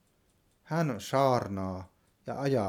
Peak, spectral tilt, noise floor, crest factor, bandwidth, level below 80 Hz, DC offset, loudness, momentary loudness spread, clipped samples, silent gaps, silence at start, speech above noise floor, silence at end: -12 dBFS; -6.5 dB/octave; -69 dBFS; 20 dB; 17 kHz; -68 dBFS; under 0.1%; -31 LUFS; 15 LU; under 0.1%; none; 0.65 s; 40 dB; 0 s